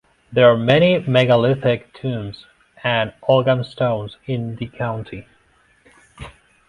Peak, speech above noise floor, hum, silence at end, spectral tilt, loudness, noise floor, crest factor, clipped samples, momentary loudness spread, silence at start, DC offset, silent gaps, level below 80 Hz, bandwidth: 0 dBFS; 40 dB; none; 0.4 s; -7.5 dB/octave; -18 LUFS; -57 dBFS; 20 dB; under 0.1%; 20 LU; 0.3 s; under 0.1%; none; -50 dBFS; 10.5 kHz